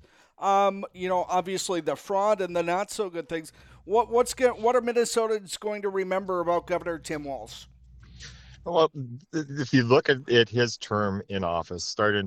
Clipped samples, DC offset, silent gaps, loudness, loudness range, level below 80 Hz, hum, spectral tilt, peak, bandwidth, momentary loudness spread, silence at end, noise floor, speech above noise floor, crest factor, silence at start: under 0.1%; under 0.1%; none; -26 LUFS; 5 LU; -58 dBFS; none; -4.5 dB/octave; -6 dBFS; 15.5 kHz; 13 LU; 0 s; -49 dBFS; 23 dB; 20 dB; 0.4 s